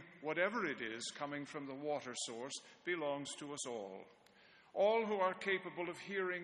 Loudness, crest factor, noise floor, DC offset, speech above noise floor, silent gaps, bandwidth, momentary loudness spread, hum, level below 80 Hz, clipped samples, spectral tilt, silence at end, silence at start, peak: -40 LUFS; 20 dB; -66 dBFS; under 0.1%; 25 dB; none; 10 kHz; 12 LU; none; -86 dBFS; under 0.1%; -3 dB/octave; 0 s; 0 s; -22 dBFS